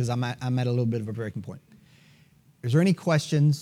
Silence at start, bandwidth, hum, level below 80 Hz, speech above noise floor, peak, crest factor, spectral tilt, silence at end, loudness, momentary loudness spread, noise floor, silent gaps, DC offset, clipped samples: 0 s; 13 kHz; none; -68 dBFS; 34 dB; -10 dBFS; 16 dB; -7 dB/octave; 0 s; -26 LUFS; 15 LU; -58 dBFS; none; under 0.1%; under 0.1%